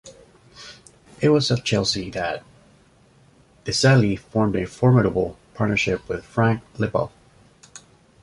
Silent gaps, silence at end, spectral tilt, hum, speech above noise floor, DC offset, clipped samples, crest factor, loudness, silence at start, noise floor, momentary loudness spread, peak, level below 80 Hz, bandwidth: none; 0.45 s; -5.5 dB/octave; none; 35 dB; under 0.1%; under 0.1%; 18 dB; -21 LUFS; 0.05 s; -55 dBFS; 16 LU; -4 dBFS; -48 dBFS; 11.5 kHz